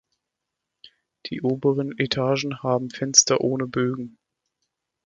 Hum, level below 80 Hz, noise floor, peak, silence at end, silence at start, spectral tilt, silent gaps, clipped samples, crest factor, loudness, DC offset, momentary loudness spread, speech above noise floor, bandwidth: none; -62 dBFS; -83 dBFS; 0 dBFS; 0.95 s; 0.85 s; -3 dB/octave; none; under 0.1%; 26 dB; -22 LUFS; under 0.1%; 17 LU; 60 dB; 11 kHz